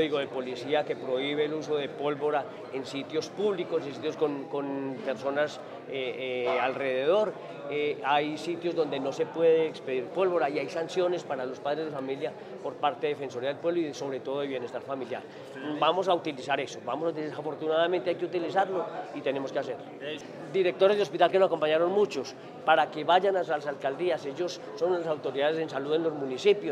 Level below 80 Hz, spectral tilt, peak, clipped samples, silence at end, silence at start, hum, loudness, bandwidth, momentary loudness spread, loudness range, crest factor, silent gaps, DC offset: -84 dBFS; -5 dB/octave; -8 dBFS; under 0.1%; 0 s; 0 s; none; -29 LUFS; 11 kHz; 11 LU; 5 LU; 22 dB; none; under 0.1%